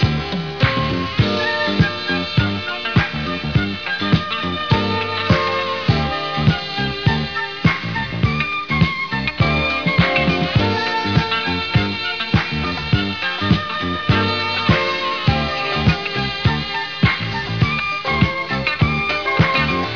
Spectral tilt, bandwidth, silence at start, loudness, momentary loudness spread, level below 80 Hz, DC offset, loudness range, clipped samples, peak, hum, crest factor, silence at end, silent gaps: -6.5 dB/octave; 5.4 kHz; 0 s; -18 LUFS; 5 LU; -34 dBFS; 0.6%; 2 LU; under 0.1%; 0 dBFS; none; 18 dB; 0 s; none